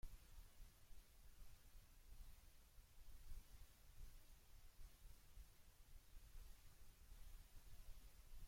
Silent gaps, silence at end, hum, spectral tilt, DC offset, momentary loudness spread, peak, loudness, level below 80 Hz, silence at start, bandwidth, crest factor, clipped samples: none; 0 s; none; -3.5 dB/octave; under 0.1%; 4 LU; -42 dBFS; -68 LUFS; -62 dBFS; 0.05 s; 16.5 kHz; 18 dB; under 0.1%